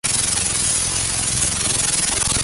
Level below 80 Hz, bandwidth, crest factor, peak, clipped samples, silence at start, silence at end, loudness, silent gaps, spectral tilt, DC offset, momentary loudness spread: -36 dBFS; 12 kHz; 16 dB; -4 dBFS; under 0.1%; 0.05 s; 0 s; -17 LUFS; none; -1 dB/octave; under 0.1%; 2 LU